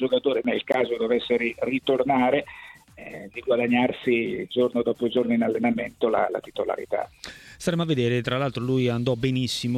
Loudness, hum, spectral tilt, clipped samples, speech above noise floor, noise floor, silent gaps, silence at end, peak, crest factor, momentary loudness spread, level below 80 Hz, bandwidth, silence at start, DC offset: -24 LUFS; none; -6 dB/octave; under 0.1%; 20 dB; -44 dBFS; none; 0 s; -6 dBFS; 18 dB; 14 LU; -58 dBFS; 14 kHz; 0 s; under 0.1%